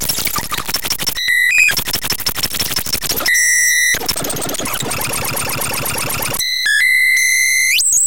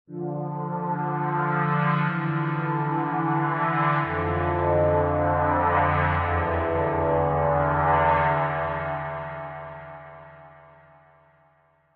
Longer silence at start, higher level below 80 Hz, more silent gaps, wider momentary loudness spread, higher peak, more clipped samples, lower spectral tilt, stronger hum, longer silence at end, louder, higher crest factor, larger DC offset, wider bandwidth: about the same, 0 s vs 0.1 s; about the same, -40 dBFS vs -44 dBFS; neither; about the same, 9 LU vs 11 LU; first, 0 dBFS vs -8 dBFS; neither; second, 0 dB/octave vs -6.5 dB/octave; neither; second, 0 s vs 1.4 s; first, -14 LUFS vs -24 LUFS; about the same, 16 dB vs 16 dB; first, 4% vs under 0.1%; first, 18 kHz vs 4.5 kHz